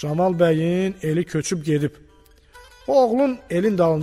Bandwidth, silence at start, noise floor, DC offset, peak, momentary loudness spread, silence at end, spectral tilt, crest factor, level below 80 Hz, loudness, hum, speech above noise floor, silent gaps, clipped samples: 15 kHz; 0 s; -52 dBFS; under 0.1%; -6 dBFS; 6 LU; 0 s; -6.5 dB/octave; 14 dB; -52 dBFS; -21 LUFS; none; 32 dB; none; under 0.1%